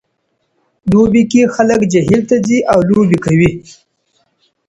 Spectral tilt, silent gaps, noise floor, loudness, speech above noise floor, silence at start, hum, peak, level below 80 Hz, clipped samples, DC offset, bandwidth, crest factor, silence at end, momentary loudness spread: -7 dB/octave; none; -66 dBFS; -11 LUFS; 55 dB; 0.85 s; none; 0 dBFS; -40 dBFS; under 0.1%; under 0.1%; 11 kHz; 12 dB; 1.1 s; 4 LU